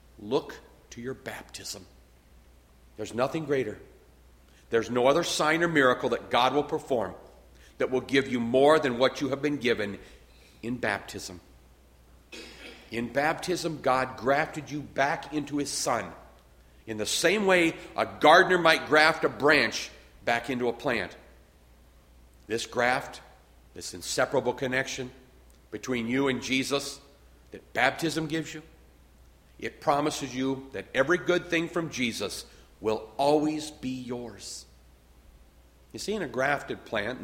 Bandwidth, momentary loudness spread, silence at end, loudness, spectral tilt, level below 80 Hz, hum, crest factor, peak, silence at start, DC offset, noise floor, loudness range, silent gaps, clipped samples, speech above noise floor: 16.5 kHz; 18 LU; 0 s; -27 LUFS; -4 dB/octave; -58 dBFS; none; 24 dB; -4 dBFS; 0.2 s; under 0.1%; -57 dBFS; 11 LU; none; under 0.1%; 30 dB